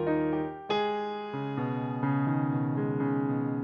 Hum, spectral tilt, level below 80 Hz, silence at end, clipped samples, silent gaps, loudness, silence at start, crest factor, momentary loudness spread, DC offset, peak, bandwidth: none; -9 dB/octave; -64 dBFS; 0 s; under 0.1%; none; -30 LUFS; 0 s; 14 dB; 5 LU; under 0.1%; -16 dBFS; 6.6 kHz